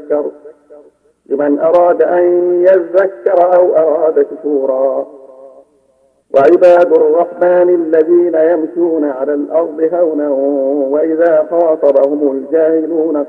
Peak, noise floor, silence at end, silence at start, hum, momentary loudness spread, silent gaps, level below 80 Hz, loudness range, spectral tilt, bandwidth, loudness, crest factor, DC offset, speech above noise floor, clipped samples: 0 dBFS; -54 dBFS; 0 s; 0 s; none; 7 LU; none; -64 dBFS; 3 LU; -8 dB/octave; 4.8 kHz; -11 LUFS; 12 dB; under 0.1%; 44 dB; 0.4%